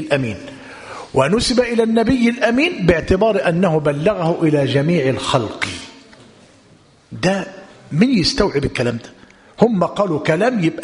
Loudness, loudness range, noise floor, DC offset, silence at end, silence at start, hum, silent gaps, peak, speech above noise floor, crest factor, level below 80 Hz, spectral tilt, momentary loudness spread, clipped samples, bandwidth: -17 LUFS; 5 LU; -50 dBFS; under 0.1%; 0 s; 0 s; none; none; 0 dBFS; 33 dB; 18 dB; -38 dBFS; -6 dB/octave; 15 LU; under 0.1%; 11 kHz